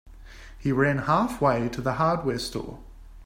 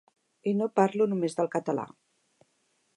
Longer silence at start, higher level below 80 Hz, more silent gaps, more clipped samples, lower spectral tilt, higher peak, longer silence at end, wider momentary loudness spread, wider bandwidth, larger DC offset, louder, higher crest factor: second, 0.05 s vs 0.45 s; first, -46 dBFS vs -82 dBFS; neither; neither; about the same, -6.5 dB/octave vs -7 dB/octave; about the same, -8 dBFS vs -10 dBFS; second, 0 s vs 1.1 s; about the same, 10 LU vs 9 LU; first, 16 kHz vs 11 kHz; neither; first, -25 LUFS vs -28 LUFS; about the same, 18 dB vs 20 dB